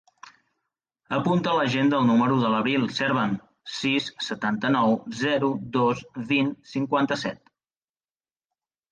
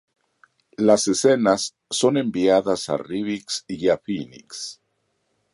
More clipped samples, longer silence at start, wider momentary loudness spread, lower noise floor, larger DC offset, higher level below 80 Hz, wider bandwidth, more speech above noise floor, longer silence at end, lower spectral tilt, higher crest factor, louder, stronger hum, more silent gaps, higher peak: neither; second, 0.25 s vs 0.8 s; second, 9 LU vs 15 LU; first, under -90 dBFS vs -72 dBFS; neither; about the same, -64 dBFS vs -62 dBFS; second, 9.2 kHz vs 11.5 kHz; first, over 66 dB vs 50 dB; first, 1.55 s vs 0.8 s; first, -6 dB/octave vs -4 dB/octave; second, 14 dB vs 20 dB; second, -24 LUFS vs -21 LUFS; neither; neither; second, -10 dBFS vs -2 dBFS